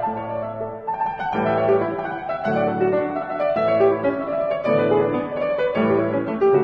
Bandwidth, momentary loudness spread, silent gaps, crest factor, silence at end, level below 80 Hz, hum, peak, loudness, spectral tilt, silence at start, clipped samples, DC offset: 5.8 kHz; 9 LU; none; 14 dB; 0 s; -54 dBFS; none; -6 dBFS; -21 LUFS; -9 dB/octave; 0 s; under 0.1%; under 0.1%